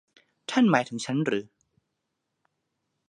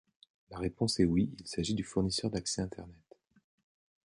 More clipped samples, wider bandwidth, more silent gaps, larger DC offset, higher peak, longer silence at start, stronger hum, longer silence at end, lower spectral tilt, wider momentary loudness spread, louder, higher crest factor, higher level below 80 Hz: neither; about the same, 10.5 kHz vs 11.5 kHz; neither; neither; first, -6 dBFS vs -14 dBFS; about the same, 0.5 s vs 0.5 s; neither; first, 1.65 s vs 1.1 s; about the same, -5.5 dB/octave vs -5 dB/octave; second, 10 LU vs 15 LU; first, -26 LUFS vs -33 LUFS; about the same, 24 dB vs 20 dB; second, -78 dBFS vs -54 dBFS